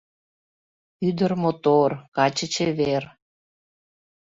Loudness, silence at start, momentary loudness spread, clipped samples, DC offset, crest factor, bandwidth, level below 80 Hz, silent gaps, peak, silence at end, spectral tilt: -23 LUFS; 1 s; 8 LU; under 0.1%; under 0.1%; 20 dB; 8 kHz; -62 dBFS; 2.08-2.12 s; -4 dBFS; 1.2 s; -5.5 dB/octave